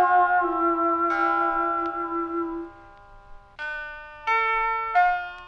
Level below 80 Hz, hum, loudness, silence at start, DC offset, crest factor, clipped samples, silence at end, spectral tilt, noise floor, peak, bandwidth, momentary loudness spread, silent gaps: -52 dBFS; none; -24 LUFS; 0 s; under 0.1%; 16 dB; under 0.1%; 0 s; -5.5 dB/octave; -48 dBFS; -8 dBFS; 6.8 kHz; 12 LU; none